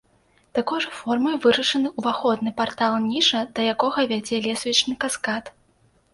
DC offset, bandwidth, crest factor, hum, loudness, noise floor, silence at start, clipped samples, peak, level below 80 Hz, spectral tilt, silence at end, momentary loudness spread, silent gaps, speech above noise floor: under 0.1%; 11.5 kHz; 18 dB; none; -22 LUFS; -61 dBFS; 0.55 s; under 0.1%; -4 dBFS; -62 dBFS; -3 dB/octave; 0.65 s; 7 LU; none; 39 dB